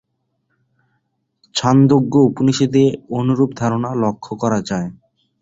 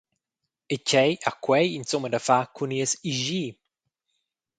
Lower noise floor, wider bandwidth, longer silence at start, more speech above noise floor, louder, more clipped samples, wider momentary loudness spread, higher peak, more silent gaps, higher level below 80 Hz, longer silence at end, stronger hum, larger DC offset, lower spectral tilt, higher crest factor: second, -70 dBFS vs -85 dBFS; second, 8 kHz vs 9.6 kHz; first, 1.55 s vs 0.7 s; second, 54 dB vs 60 dB; first, -17 LUFS vs -25 LUFS; neither; about the same, 10 LU vs 8 LU; about the same, -2 dBFS vs -4 dBFS; neither; first, -52 dBFS vs -70 dBFS; second, 0.45 s vs 1.05 s; neither; neither; first, -6.5 dB/octave vs -3.5 dB/octave; second, 16 dB vs 22 dB